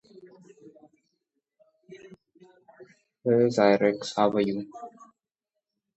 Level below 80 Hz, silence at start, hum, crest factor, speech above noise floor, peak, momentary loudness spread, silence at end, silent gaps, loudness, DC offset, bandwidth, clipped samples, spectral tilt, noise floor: -72 dBFS; 1.9 s; none; 22 dB; 63 dB; -6 dBFS; 21 LU; 1.1 s; none; -24 LUFS; under 0.1%; 8.2 kHz; under 0.1%; -6 dB/octave; -86 dBFS